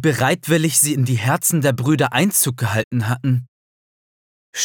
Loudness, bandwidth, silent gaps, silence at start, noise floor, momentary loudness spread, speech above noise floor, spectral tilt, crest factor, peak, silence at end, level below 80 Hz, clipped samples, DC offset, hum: -17 LUFS; over 20 kHz; 2.84-2.91 s, 3.48-4.53 s; 0 s; under -90 dBFS; 6 LU; over 72 dB; -4.5 dB/octave; 16 dB; -4 dBFS; 0 s; -62 dBFS; under 0.1%; under 0.1%; none